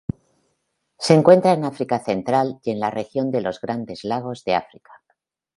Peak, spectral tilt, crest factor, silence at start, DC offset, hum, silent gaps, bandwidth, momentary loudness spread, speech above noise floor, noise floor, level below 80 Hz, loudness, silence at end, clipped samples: 0 dBFS; -6.5 dB/octave; 20 dB; 1 s; under 0.1%; none; none; 11.5 kHz; 14 LU; 53 dB; -73 dBFS; -56 dBFS; -20 LUFS; 0.95 s; under 0.1%